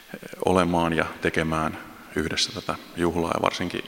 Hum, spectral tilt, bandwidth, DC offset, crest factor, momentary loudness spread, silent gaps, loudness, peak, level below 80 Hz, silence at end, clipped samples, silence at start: none; -4.5 dB/octave; 16.5 kHz; under 0.1%; 22 dB; 10 LU; none; -25 LUFS; -2 dBFS; -48 dBFS; 0 s; under 0.1%; 0 s